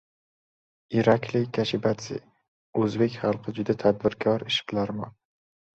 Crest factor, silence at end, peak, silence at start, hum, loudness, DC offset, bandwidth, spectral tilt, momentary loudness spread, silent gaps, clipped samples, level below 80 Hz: 20 dB; 0.7 s; -6 dBFS; 0.9 s; none; -26 LUFS; under 0.1%; 8.2 kHz; -6 dB/octave; 10 LU; 2.48-2.73 s; under 0.1%; -62 dBFS